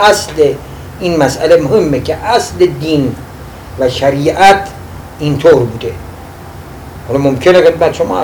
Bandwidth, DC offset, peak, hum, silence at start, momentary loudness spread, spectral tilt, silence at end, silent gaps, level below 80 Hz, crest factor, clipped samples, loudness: over 20 kHz; under 0.1%; 0 dBFS; none; 0 s; 22 LU; -5.5 dB/octave; 0 s; none; -34 dBFS; 12 dB; 2%; -11 LUFS